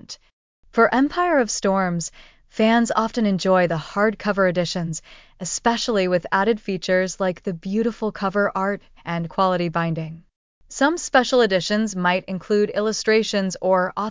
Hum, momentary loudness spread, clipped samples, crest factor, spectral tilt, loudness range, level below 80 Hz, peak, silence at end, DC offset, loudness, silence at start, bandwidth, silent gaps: none; 10 LU; under 0.1%; 16 dB; -4.5 dB/octave; 3 LU; -54 dBFS; -4 dBFS; 0 s; under 0.1%; -21 LUFS; 0.1 s; 7.8 kHz; 0.33-0.63 s, 10.36-10.61 s